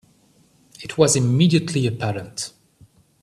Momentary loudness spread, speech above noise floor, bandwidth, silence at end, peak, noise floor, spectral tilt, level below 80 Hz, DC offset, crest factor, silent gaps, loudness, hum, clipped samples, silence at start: 14 LU; 38 dB; 13 kHz; 0.75 s; -2 dBFS; -57 dBFS; -5 dB/octave; -56 dBFS; under 0.1%; 20 dB; none; -20 LUFS; none; under 0.1%; 0.8 s